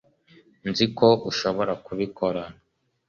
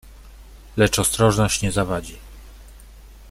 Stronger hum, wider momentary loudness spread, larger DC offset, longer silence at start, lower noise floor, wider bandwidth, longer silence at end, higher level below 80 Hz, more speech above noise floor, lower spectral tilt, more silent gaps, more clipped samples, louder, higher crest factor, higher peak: neither; second, 14 LU vs 17 LU; neither; first, 0.65 s vs 0.05 s; first, -57 dBFS vs -43 dBFS; second, 7.2 kHz vs 16 kHz; first, 0.55 s vs 0 s; second, -58 dBFS vs -38 dBFS; first, 33 dB vs 24 dB; first, -5.5 dB/octave vs -4 dB/octave; neither; neither; second, -24 LUFS vs -20 LUFS; about the same, 20 dB vs 20 dB; about the same, -4 dBFS vs -4 dBFS